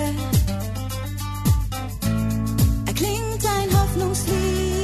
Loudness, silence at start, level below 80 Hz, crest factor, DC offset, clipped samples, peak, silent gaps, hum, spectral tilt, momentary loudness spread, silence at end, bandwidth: -23 LUFS; 0 s; -28 dBFS; 14 dB; under 0.1%; under 0.1%; -6 dBFS; none; none; -5.5 dB/octave; 8 LU; 0 s; 14 kHz